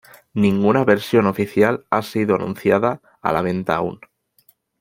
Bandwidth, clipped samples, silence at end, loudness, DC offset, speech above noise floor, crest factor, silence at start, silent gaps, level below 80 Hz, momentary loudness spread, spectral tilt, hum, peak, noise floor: 16.5 kHz; under 0.1%; 0.85 s; -19 LUFS; under 0.1%; 40 dB; 18 dB; 0.35 s; none; -56 dBFS; 7 LU; -7 dB/octave; none; -2 dBFS; -59 dBFS